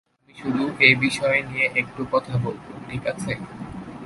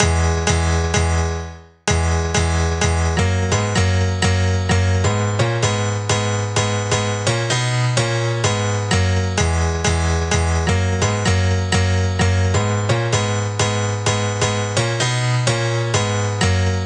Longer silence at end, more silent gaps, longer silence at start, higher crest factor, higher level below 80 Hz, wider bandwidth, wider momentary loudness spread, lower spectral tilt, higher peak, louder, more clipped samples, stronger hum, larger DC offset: about the same, 0 s vs 0 s; neither; first, 0.35 s vs 0 s; first, 24 dB vs 18 dB; second, -52 dBFS vs -30 dBFS; about the same, 11.5 kHz vs 10.5 kHz; first, 19 LU vs 2 LU; about the same, -5 dB/octave vs -4.5 dB/octave; about the same, 0 dBFS vs 0 dBFS; second, -21 LUFS vs -18 LUFS; neither; neither; neither